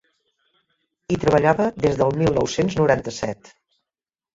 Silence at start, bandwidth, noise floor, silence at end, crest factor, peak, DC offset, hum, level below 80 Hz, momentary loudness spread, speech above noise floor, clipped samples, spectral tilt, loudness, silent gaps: 1.1 s; 7.8 kHz; under -90 dBFS; 1 s; 20 dB; -4 dBFS; under 0.1%; none; -46 dBFS; 11 LU; over 70 dB; under 0.1%; -6 dB/octave; -20 LUFS; none